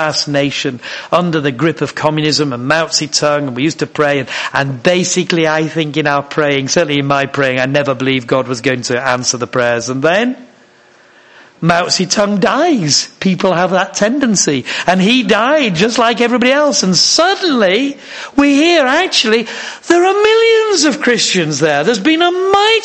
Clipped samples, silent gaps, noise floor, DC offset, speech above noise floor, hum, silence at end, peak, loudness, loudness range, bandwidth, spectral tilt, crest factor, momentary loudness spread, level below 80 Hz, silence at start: under 0.1%; none; -45 dBFS; under 0.1%; 33 dB; none; 0 s; 0 dBFS; -12 LUFS; 4 LU; 9.8 kHz; -3.5 dB/octave; 12 dB; 6 LU; -52 dBFS; 0 s